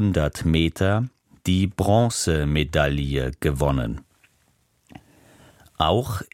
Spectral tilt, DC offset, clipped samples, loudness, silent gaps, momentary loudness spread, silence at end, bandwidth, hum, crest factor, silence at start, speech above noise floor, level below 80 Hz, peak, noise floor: -5.5 dB/octave; under 0.1%; under 0.1%; -23 LUFS; none; 6 LU; 0.1 s; 16.5 kHz; none; 18 dB; 0 s; 43 dB; -34 dBFS; -4 dBFS; -65 dBFS